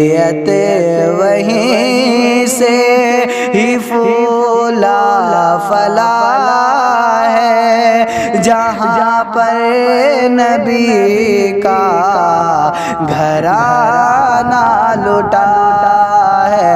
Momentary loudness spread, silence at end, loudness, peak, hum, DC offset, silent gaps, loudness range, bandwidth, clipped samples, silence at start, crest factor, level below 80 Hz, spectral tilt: 3 LU; 0 s; -10 LUFS; 0 dBFS; none; under 0.1%; none; 1 LU; 15.5 kHz; under 0.1%; 0 s; 10 dB; -48 dBFS; -4.5 dB/octave